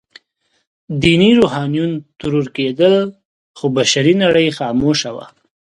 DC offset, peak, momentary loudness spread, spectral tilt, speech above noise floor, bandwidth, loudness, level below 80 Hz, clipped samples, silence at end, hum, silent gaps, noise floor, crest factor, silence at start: under 0.1%; 0 dBFS; 12 LU; -5 dB/octave; 51 dB; 11.5 kHz; -15 LUFS; -46 dBFS; under 0.1%; 0.55 s; none; 3.25-3.54 s; -65 dBFS; 16 dB; 0.9 s